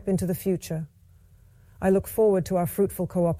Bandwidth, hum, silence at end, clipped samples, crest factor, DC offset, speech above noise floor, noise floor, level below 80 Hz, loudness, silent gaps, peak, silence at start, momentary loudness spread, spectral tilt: 16.5 kHz; none; 0 s; under 0.1%; 14 dB; under 0.1%; 30 dB; -54 dBFS; -50 dBFS; -25 LUFS; none; -12 dBFS; 0 s; 11 LU; -7.5 dB/octave